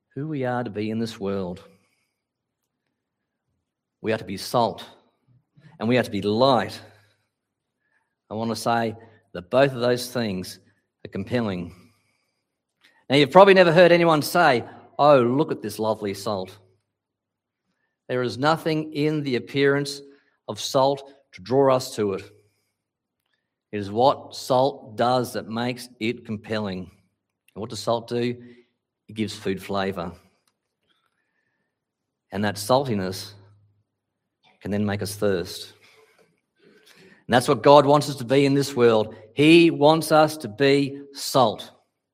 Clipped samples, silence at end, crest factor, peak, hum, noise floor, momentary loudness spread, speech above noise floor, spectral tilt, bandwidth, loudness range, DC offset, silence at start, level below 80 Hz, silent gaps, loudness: under 0.1%; 0.45 s; 24 dB; 0 dBFS; none; -84 dBFS; 19 LU; 62 dB; -5.5 dB/octave; 16 kHz; 13 LU; under 0.1%; 0.15 s; -68 dBFS; none; -22 LUFS